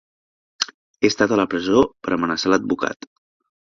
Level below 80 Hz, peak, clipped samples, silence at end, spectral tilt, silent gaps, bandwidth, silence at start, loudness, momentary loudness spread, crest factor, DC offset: -54 dBFS; -2 dBFS; under 0.1%; 0.7 s; -4 dB/octave; 0.74-0.94 s; 7.4 kHz; 0.6 s; -20 LUFS; 9 LU; 20 dB; under 0.1%